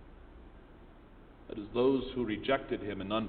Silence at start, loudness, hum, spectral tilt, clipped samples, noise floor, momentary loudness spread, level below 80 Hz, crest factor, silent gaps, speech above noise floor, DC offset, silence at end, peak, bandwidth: 0 s; -33 LUFS; none; -9.5 dB/octave; under 0.1%; -55 dBFS; 25 LU; -54 dBFS; 20 dB; none; 23 dB; under 0.1%; 0 s; -14 dBFS; 4.5 kHz